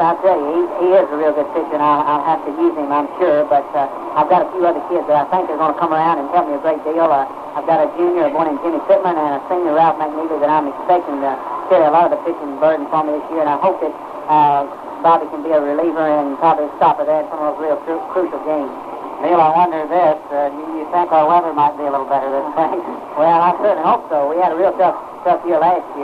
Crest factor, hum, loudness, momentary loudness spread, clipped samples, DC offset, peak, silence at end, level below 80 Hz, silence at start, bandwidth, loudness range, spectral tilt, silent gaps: 14 dB; none; -16 LUFS; 7 LU; under 0.1%; under 0.1%; -2 dBFS; 0 s; -60 dBFS; 0 s; 6 kHz; 2 LU; -7.5 dB/octave; none